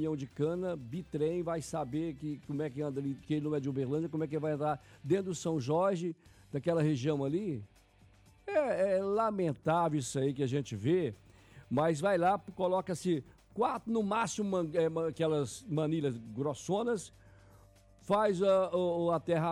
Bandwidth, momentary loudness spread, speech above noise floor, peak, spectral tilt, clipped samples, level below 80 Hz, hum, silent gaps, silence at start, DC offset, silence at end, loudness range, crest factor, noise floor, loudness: 13 kHz; 8 LU; 30 dB; -18 dBFS; -6.5 dB/octave; under 0.1%; -66 dBFS; none; none; 0 s; under 0.1%; 0 s; 3 LU; 14 dB; -62 dBFS; -33 LUFS